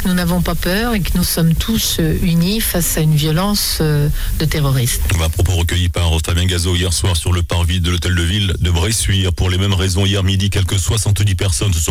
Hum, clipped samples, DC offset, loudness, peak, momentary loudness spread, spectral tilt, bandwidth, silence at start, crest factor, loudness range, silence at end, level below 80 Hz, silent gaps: none; under 0.1%; under 0.1%; -16 LUFS; -6 dBFS; 2 LU; -4.5 dB/octave; 17 kHz; 0 s; 8 dB; 1 LU; 0 s; -24 dBFS; none